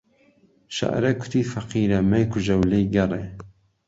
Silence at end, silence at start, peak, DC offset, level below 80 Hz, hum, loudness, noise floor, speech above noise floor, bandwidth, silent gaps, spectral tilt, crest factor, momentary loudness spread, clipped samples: 0.4 s; 0.7 s; -6 dBFS; under 0.1%; -44 dBFS; none; -23 LUFS; -59 dBFS; 37 dB; 8 kHz; none; -7 dB/octave; 16 dB; 12 LU; under 0.1%